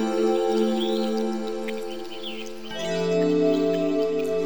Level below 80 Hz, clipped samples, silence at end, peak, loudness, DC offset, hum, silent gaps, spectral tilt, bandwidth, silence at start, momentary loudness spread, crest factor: -64 dBFS; under 0.1%; 0 s; -10 dBFS; -25 LUFS; 1%; none; none; -5.5 dB/octave; over 20 kHz; 0 s; 12 LU; 14 dB